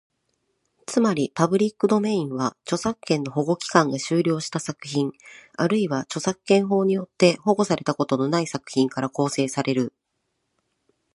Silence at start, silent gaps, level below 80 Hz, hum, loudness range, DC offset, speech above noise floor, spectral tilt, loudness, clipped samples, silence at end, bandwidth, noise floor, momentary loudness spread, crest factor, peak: 0.9 s; none; -66 dBFS; none; 2 LU; under 0.1%; 53 dB; -5.5 dB/octave; -23 LUFS; under 0.1%; 1.25 s; 11.5 kHz; -76 dBFS; 7 LU; 22 dB; 0 dBFS